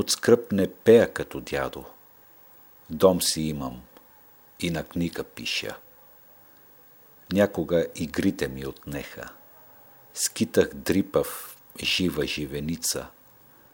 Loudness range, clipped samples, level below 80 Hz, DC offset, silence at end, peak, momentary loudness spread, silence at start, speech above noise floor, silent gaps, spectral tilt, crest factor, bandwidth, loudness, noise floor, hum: 8 LU; under 0.1%; -52 dBFS; under 0.1%; 0.65 s; -4 dBFS; 18 LU; 0 s; 29 dB; none; -4 dB/octave; 24 dB; 20 kHz; -25 LUFS; -54 dBFS; none